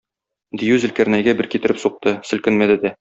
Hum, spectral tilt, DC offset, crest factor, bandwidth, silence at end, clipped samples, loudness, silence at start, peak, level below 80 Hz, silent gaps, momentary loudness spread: none; -5.5 dB/octave; under 0.1%; 16 dB; 8 kHz; 0.05 s; under 0.1%; -18 LUFS; 0.55 s; -2 dBFS; -56 dBFS; none; 6 LU